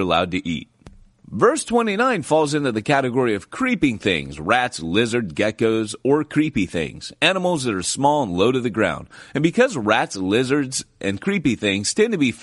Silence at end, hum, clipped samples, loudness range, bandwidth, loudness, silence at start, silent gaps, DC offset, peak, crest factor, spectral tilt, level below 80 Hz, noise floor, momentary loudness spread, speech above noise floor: 0 s; none; under 0.1%; 1 LU; 11.5 kHz; -20 LUFS; 0 s; none; under 0.1%; -2 dBFS; 18 dB; -4.5 dB/octave; -50 dBFS; -47 dBFS; 7 LU; 27 dB